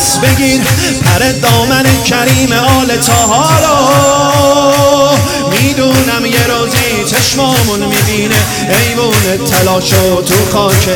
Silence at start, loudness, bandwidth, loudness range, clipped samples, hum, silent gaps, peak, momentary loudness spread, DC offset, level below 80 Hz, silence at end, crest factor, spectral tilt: 0 s; -8 LUFS; over 20 kHz; 2 LU; under 0.1%; none; none; 0 dBFS; 3 LU; under 0.1%; -32 dBFS; 0 s; 8 dB; -4 dB/octave